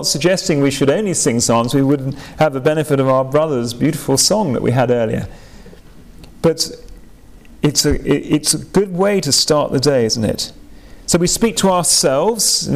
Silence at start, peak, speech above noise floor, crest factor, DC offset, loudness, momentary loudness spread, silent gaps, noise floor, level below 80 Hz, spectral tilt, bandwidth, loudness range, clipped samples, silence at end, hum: 0 s; -4 dBFS; 26 dB; 12 dB; 0.5%; -15 LUFS; 7 LU; none; -41 dBFS; -38 dBFS; -4 dB/octave; 16 kHz; 5 LU; under 0.1%; 0 s; none